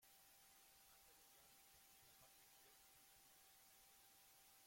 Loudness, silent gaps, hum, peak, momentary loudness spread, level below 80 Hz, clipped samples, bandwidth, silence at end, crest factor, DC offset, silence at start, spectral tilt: -68 LUFS; none; none; -56 dBFS; 1 LU; -90 dBFS; under 0.1%; 16.5 kHz; 0 s; 14 dB; under 0.1%; 0 s; -0.5 dB/octave